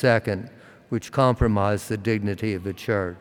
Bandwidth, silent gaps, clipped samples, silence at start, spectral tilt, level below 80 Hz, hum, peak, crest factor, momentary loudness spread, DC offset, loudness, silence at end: 17.5 kHz; none; under 0.1%; 0 s; -7 dB/octave; -42 dBFS; none; -4 dBFS; 18 dB; 11 LU; under 0.1%; -24 LUFS; 0 s